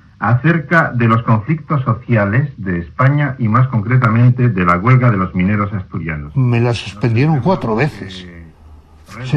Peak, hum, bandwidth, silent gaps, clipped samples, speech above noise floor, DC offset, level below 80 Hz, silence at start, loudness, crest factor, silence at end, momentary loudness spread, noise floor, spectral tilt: 0 dBFS; none; 7 kHz; none; under 0.1%; 27 dB; under 0.1%; -42 dBFS; 0.2 s; -14 LUFS; 14 dB; 0 s; 10 LU; -41 dBFS; -8.5 dB/octave